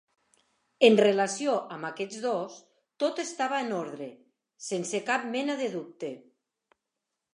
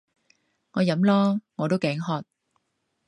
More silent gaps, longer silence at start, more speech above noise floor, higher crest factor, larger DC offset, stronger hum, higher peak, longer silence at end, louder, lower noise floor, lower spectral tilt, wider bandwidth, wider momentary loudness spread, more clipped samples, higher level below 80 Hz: neither; about the same, 0.8 s vs 0.75 s; first, 58 dB vs 53 dB; first, 24 dB vs 18 dB; neither; neither; about the same, -6 dBFS vs -8 dBFS; first, 1.15 s vs 0.85 s; second, -28 LUFS vs -25 LUFS; first, -85 dBFS vs -76 dBFS; second, -4 dB/octave vs -7.5 dB/octave; about the same, 11.5 kHz vs 10.5 kHz; first, 17 LU vs 11 LU; neither; second, -86 dBFS vs -70 dBFS